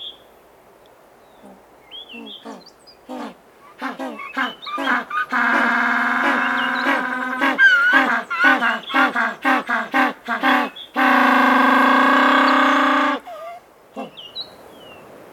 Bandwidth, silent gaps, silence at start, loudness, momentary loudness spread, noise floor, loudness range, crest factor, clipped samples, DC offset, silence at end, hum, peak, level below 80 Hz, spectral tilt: 17.5 kHz; none; 0 s; -17 LUFS; 21 LU; -49 dBFS; 16 LU; 18 dB; under 0.1%; under 0.1%; 0.1 s; none; 0 dBFS; -68 dBFS; -3 dB/octave